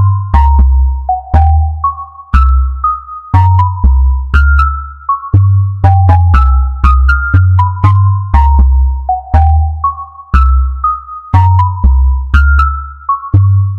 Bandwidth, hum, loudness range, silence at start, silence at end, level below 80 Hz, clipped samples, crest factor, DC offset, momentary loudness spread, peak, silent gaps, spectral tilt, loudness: 4.3 kHz; none; 2 LU; 0 s; 0 s; -12 dBFS; 0.2%; 8 dB; under 0.1%; 8 LU; 0 dBFS; none; -9 dB/octave; -10 LUFS